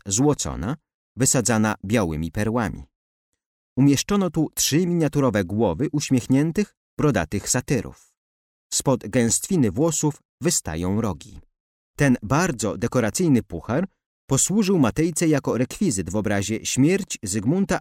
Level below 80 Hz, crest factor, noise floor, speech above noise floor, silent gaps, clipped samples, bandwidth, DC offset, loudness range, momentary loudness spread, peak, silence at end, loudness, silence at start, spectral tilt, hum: -46 dBFS; 14 dB; under -90 dBFS; over 68 dB; 0.94-1.15 s, 2.95-3.33 s, 3.46-3.76 s, 6.77-6.97 s, 8.17-8.70 s, 10.25-10.38 s, 11.60-11.94 s, 14.06-14.28 s; under 0.1%; 16.5 kHz; under 0.1%; 2 LU; 7 LU; -8 dBFS; 0 s; -22 LUFS; 0.05 s; -5 dB/octave; none